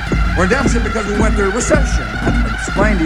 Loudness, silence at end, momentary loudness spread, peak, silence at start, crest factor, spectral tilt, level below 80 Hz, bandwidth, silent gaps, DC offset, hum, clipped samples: -16 LUFS; 0 s; 4 LU; 0 dBFS; 0 s; 14 dB; -5.5 dB/octave; -18 dBFS; 11 kHz; none; under 0.1%; none; under 0.1%